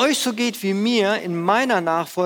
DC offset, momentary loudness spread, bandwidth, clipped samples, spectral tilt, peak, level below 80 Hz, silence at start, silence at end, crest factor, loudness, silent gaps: under 0.1%; 4 LU; 19.5 kHz; under 0.1%; -4 dB/octave; -4 dBFS; -72 dBFS; 0 s; 0 s; 16 dB; -20 LUFS; none